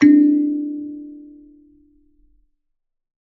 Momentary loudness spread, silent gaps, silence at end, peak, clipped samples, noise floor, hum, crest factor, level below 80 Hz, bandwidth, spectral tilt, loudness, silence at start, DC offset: 25 LU; none; 2.05 s; -2 dBFS; under 0.1%; -71 dBFS; none; 18 dB; -64 dBFS; 6 kHz; -6 dB/octave; -17 LUFS; 0 s; under 0.1%